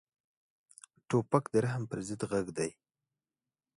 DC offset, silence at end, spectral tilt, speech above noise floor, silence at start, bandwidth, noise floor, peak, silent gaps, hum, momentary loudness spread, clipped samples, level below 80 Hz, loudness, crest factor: under 0.1%; 1.05 s; -6.5 dB/octave; over 58 dB; 1.1 s; 11.5 kHz; under -90 dBFS; -12 dBFS; none; none; 8 LU; under 0.1%; -68 dBFS; -33 LUFS; 24 dB